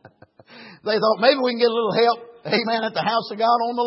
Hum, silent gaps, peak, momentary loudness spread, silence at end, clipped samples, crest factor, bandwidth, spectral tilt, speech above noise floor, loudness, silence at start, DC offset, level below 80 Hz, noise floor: none; none; -2 dBFS; 6 LU; 0 s; under 0.1%; 20 dB; 5.8 kHz; -8.5 dB/octave; 30 dB; -20 LUFS; 0.5 s; under 0.1%; -76 dBFS; -50 dBFS